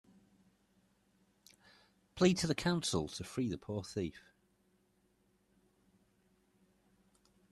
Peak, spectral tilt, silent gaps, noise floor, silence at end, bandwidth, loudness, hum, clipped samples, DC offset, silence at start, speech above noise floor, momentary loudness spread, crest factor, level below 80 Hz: -16 dBFS; -5 dB/octave; none; -75 dBFS; 3.3 s; 12.5 kHz; -36 LUFS; 50 Hz at -65 dBFS; under 0.1%; under 0.1%; 2.15 s; 40 dB; 11 LU; 24 dB; -66 dBFS